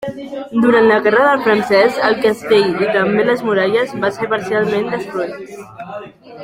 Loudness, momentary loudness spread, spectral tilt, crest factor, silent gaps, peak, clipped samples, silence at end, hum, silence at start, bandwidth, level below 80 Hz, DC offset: -14 LUFS; 19 LU; -5.5 dB/octave; 14 dB; none; 0 dBFS; under 0.1%; 0 s; none; 0 s; 15.5 kHz; -56 dBFS; under 0.1%